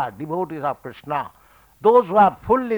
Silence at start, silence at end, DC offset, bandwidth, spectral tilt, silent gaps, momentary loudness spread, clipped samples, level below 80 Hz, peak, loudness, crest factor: 0 s; 0 s; under 0.1%; over 20 kHz; -8 dB/octave; none; 12 LU; under 0.1%; -54 dBFS; -4 dBFS; -20 LUFS; 16 dB